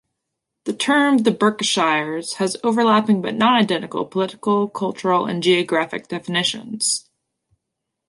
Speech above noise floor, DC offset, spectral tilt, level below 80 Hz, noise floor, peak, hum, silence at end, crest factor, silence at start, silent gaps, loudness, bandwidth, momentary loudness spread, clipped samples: 61 dB; under 0.1%; -3.5 dB/octave; -68 dBFS; -80 dBFS; -2 dBFS; none; 1.1 s; 18 dB; 0.65 s; none; -19 LUFS; 11.5 kHz; 8 LU; under 0.1%